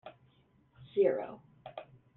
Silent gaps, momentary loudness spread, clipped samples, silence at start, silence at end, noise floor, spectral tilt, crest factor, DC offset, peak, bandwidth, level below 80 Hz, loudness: none; 21 LU; under 0.1%; 0.05 s; 0.35 s; -68 dBFS; -5.5 dB/octave; 20 dB; under 0.1%; -16 dBFS; 4.1 kHz; -76 dBFS; -32 LUFS